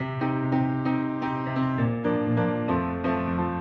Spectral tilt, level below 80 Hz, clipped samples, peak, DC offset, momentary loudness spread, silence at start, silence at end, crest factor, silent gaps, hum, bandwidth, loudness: -10 dB/octave; -52 dBFS; under 0.1%; -12 dBFS; under 0.1%; 3 LU; 0 s; 0 s; 14 dB; none; none; 5.6 kHz; -26 LUFS